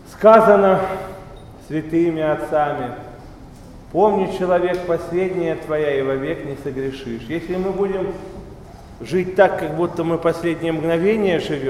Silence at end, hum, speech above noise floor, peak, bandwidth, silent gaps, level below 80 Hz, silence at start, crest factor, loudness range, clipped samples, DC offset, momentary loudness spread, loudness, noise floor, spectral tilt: 0 s; none; 21 dB; 0 dBFS; 14 kHz; none; -44 dBFS; 0 s; 20 dB; 4 LU; under 0.1%; under 0.1%; 16 LU; -19 LUFS; -39 dBFS; -7 dB/octave